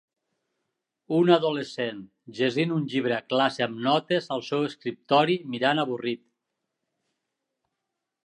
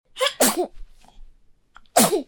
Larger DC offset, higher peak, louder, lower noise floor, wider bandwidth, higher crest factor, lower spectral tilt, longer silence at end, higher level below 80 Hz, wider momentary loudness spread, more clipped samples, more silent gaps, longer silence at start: neither; second, -6 dBFS vs -2 dBFS; second, -25 LUFS vs -21 LUFS; first, -84 dBFS vs -52 dBFS; second, 10.5 kHz vs 18 kHz; about the same, 22 dB vs 22 dB; first, -6 dB/octave vs -2 dB/octave; first, 2.1 s vs 0.05 s; second, -78 dBFS vs -48 dBFS; about the same, 11 LU vs 10 LU; neither; neither; first, 1.1 s vs 0.15 s